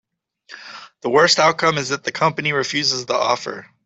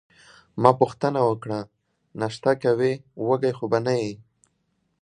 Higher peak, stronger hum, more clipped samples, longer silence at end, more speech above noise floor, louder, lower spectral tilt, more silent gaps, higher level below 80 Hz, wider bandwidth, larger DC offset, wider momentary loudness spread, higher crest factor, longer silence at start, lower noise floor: about the same, -2 dBFS vs 0 dBFS; neither; neither; second, 0.2 s vs 0.85 s; second, 30 dB vs 49 dB; first, -18 LUFS vs -23 LUFS; second, -3 dB/octave vs -7 dB/octave; neither; about the same, -64 dBFS vs -64 dBFS; second, 8.4 kHz vs 10 kHz; neither; first, 21 LU vs 14 LU; second, 18 dB vs 24 dB; about the same, 0.5 s vs 0.55 s; second, -49 dBFS vs -72 dBFS